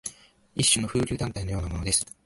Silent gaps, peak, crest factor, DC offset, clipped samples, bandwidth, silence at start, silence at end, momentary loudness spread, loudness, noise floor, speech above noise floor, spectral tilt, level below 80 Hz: none; -8 dBFS; 20 dB; under 0.1%; under 0.1%; 12 kHz; 0.05 s; 0.2 s; 12 LU; -25 LUFS; -49 dBFS; 22 dB; -3 dB/octave; -42 dBFS